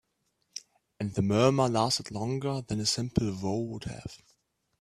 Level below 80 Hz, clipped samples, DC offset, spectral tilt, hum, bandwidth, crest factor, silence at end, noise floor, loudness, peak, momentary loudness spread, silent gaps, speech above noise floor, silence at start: -56 dBFS; under 0.1%; under 0.1%; -5 dB/octave; none; 14 kHz; 22 dB; 0.65 s; -77 dBFS; -29 LUFS; -8 dBFS; 20 LU; none; 48 dB; 0.55 s